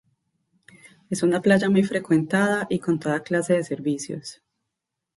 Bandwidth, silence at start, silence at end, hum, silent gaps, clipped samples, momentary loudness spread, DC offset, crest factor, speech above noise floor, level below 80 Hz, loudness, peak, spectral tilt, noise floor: 11.5 kHz; 1.1 s; 0.85 s; none; none; under 0.1%; 12 LU; under 0.1%; 18 dB; 61 dB; -64 dBFS; -23 LUFS; -6 dBFS; -6 dB/octave; -83 dBFS